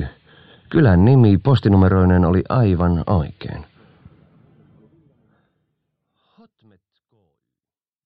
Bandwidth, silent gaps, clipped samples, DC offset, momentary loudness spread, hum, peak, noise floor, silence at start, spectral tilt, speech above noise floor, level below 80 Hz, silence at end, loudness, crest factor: 5 kHz; none; under 0.1%; under 0.1%; 19 LU; none; -2 dBFS; under -90 dBFS; 0 s; -11 dB/octave; over 76 dB; -38 dBFS; 4.45 s; -16 LUFS; 16 dB